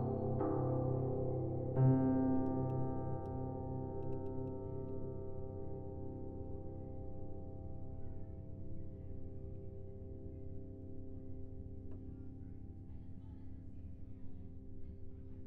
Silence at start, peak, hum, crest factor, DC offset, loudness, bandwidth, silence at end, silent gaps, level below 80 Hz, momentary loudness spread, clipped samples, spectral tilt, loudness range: 0 s; -20 dBFS; none; 20 dB; under 0.1%; -42 LUFS; 2.2 kHz; 0 s; none; -52 dBFS; 17 LU; under 0.1%; -12.5 dB/octave; 15 LU